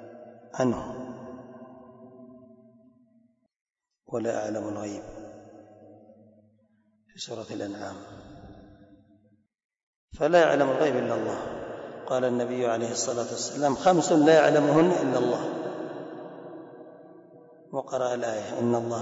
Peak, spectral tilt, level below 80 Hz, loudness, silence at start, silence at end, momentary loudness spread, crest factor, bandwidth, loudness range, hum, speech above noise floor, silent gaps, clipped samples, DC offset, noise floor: -10 dBFS; -5 dB/octave; -64 dBFS; -26 LUFS; 0 s; 0 s; 24 LU; 20 dB; 8 kHz; 18 LU; none; 42 dB; 3.61-3.65 s, 9.65-9.69 s, 9.83-10.08 s; under 0.1%; under 0.1%; -67 dBFS